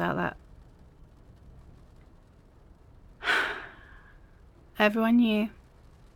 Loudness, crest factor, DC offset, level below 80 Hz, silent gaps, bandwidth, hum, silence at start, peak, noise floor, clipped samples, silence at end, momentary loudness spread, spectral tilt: -27 LUFS; 24 dB; under 0.1%; -54 dBFS; none; 16.5 kHz; none; 0 s; -8 dBFS; -56 dBFS; under 0.1%; 0.65 s; 22 LU; -5.5 dB/octave